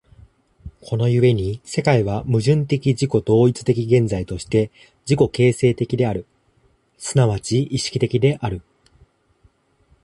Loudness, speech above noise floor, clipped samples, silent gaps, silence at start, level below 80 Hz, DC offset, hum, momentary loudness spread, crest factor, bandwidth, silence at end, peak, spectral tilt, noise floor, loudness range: -19 LUFS; 42 dB; under 0.1%; none; 0.65 s; -44 dBFS; under 0.1%; none; 10 LU; 18 dB; 11.5 kHz; 1.45 s; -2 dBFS; -6.5 dB/octave; -60 dBFS; 4 LU